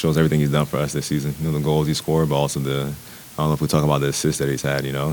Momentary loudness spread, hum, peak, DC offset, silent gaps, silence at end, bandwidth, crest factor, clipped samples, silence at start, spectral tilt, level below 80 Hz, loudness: 6 LU; none; -4 dBFS; under 0.1%; none; 0 s; 19 kHz; 16 dB; under 0.1%; 0 s; -5.5 dB/octave; -42 dBFS; -21 LUFS